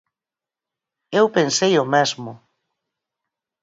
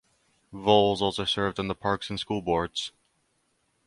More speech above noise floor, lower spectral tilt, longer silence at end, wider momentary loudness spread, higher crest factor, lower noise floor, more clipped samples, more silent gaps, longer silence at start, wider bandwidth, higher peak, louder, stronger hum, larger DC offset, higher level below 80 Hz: first, 71 dB vs 46 dB; second, -3.5 dB/octave vs -5 dB/octave; first, 1.25 s vs 0.95 s; about the same, 12 LU vs 11 LU; about the same, 20 dB vs 24 dB; first, -89 dBFS vs -72 dBFS; neither; neither; first, 1.1 s vs 0.5 s; second, 7.8 kHz vs 11.5 kHz; about the same, -4 dBFS vs -6 dBFS; first, -18 LUFS vs -26 LUFS; neither; neither; second, -70 dBFS vs -54 dBFS